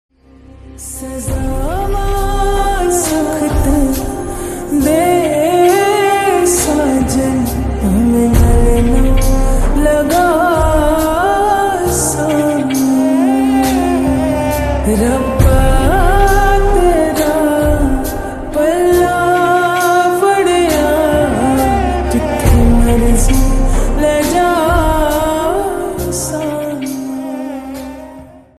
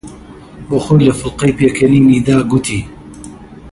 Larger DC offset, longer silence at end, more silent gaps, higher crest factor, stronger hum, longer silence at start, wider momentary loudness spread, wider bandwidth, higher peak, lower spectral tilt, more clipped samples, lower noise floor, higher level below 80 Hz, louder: neither; first, 0.2 s vs 0.05 s; neither; about the same, 12 dB vs 12 dB; neither; first, 0.65 s vs 0.05 s; second, 9 LU vs 23 LU; first, 14 kHz vs 11.5 kHz; about the same, 0 dBFS vs 0 dBFS; about the same, -5.5 dB/octave vs -6.5 dB/octave; neither; first, -39 dBFS vs -34 dBFS; first, -18 dBFS vs -36 dBFS; about the same, -13 LUFS vs -12 LUFS